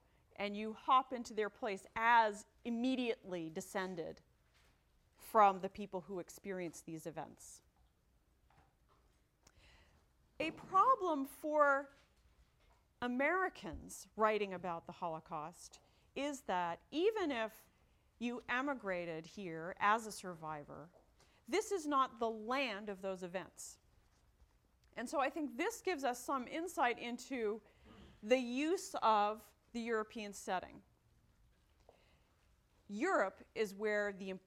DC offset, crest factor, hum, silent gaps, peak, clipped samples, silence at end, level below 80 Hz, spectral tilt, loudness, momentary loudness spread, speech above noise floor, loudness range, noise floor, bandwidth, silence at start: under 0.1%; 24 dB; none; none; -16 dBFS; under 0.1%; 0.1 s; -72 dBFS; -4 dB/octave; -38 LUFS; 17 LU; 36 dB; 7 LU; -75 dBFS; 16.5 kHz; 0.4 s